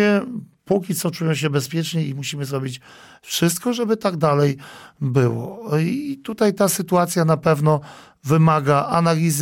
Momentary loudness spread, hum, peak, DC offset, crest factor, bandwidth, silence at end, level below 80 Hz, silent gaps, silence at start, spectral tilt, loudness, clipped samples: 11 LU; none; -6 dBFS; under 0.1%; 14 dB; 17 kHz; 0 s; -58 dBFS; none; 0 s; -5.5 dB/octave; -20 LUFS; under 0.1%